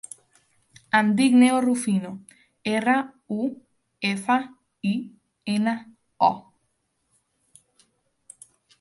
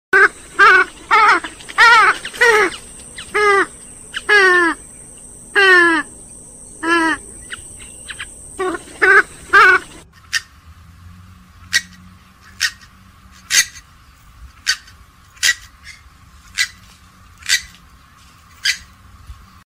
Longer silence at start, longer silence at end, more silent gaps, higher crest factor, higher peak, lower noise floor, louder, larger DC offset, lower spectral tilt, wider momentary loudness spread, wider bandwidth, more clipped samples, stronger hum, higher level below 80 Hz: first, 0.95 s vs 0.15 s; first, 2.4 s vs 0.35 s; neither; about the same, 20 dB vs 18 dB; second, -6 dBFS vs 0 dBFS; first, -73 dBFS vs -46 dBFS; second, -23 LUFS vs -14 LUFS; neither; first, -5 dB/octave vs -1 dB/octave; about the same, 20 LU vs 22 LU; second, 11.5 kHz vs 16 kHz; neither; neither; second, -72 dBFS vs -46 dBFS